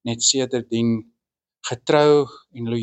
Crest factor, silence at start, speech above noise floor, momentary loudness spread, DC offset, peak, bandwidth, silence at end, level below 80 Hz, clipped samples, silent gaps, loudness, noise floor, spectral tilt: 18 dB; 0.05 s; 63 dB; 15 LU; under 0.1%; -4 dBFS; 9 kHz; 0 s; -64 dBFS; under 0.1%; none; -20 LUFS; -83 dBFS; -4 dB/octave